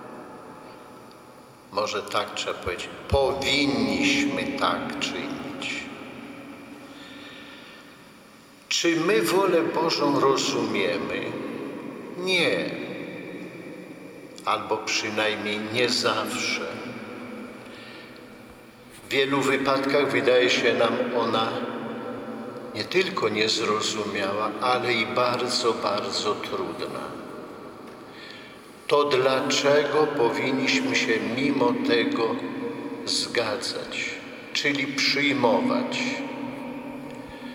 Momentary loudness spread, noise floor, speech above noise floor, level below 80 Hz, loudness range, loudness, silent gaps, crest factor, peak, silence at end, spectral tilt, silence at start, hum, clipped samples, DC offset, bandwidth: 20 LU; -50 dBFS; 26 dB; -56 dBFS; 7 LU; -24 LUFS; none; 20 dB; -6 dBFS; 0 s; -3.5 dB/octave; 0 s; none; under 0.1%; under 0.1%; 16.5 kHz